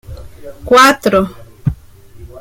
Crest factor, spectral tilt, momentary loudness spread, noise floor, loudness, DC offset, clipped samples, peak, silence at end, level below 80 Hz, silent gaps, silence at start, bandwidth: 14 dB; -4.5 dB/octave; 21 LU; -37 dBFS; -12 LUFS; under 0.1%; under 0.1%; 0 dBFS; 0 s; -36 dBFS; none; 0.1 s; 17 kHz